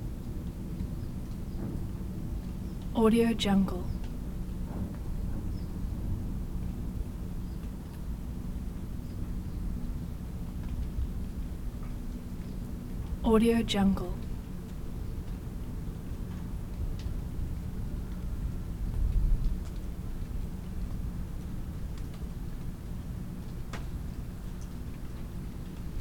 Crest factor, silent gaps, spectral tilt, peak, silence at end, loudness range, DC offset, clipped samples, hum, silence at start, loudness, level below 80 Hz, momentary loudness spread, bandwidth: 20 dB; none; -7 dB/octave; -12 dBFS; 0 s; 9 LU; under 0.1%; under 0.1%; none; 0 s; -35 LUFS; -36 dBFS; 13 LU; 18.5 kHz